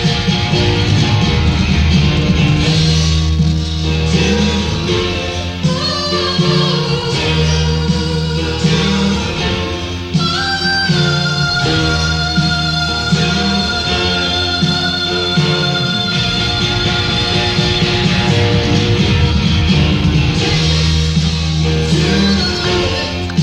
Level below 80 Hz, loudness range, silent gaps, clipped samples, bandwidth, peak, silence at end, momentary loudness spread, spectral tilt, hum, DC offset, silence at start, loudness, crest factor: -24 dBFS; 2 LU; none; under 0.1%; 11 kHz; 0 dBFS; 0 s; 4 LU; -5 dB/octave; none; under 0.1%; 0 s; -14 LUFS; 12 dB